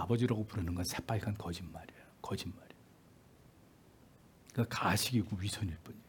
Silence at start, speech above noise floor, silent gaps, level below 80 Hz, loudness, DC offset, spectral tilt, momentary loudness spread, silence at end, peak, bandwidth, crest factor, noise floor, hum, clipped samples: 0 s; 26 dB; none; -62 dBFS; -37 LUFS; under 0.1%; -5 dB/octave; 17 LU; 0.05 s; -16 dBFS; 18 kHz; 22 dB; -62 dBFS; none; under 0.1%